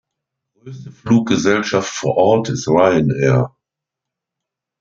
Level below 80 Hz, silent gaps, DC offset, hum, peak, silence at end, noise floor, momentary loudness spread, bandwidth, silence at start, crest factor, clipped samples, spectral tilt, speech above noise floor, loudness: -52 dBFS; none; under 0.1%; none; -2 dBFS; 1.35 s; -83 dBFS; 13 LU; 7.6 kHz; 0.65 s; 16 dB; under 0.1%; -6 dB/octave; 68 dB; -16 LUFS